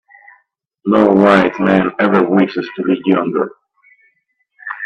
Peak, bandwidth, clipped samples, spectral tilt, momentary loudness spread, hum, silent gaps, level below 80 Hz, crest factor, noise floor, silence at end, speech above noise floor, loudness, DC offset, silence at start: 0 dBFS; 8.4 kHz; under 0.1%; -8 dB/octave; 14 LU; none; none; -54 dBFS; 16 dB; -64 dBFS; 0 s; 52 dB; -14 LUFS; under 0.1%; 0.85 s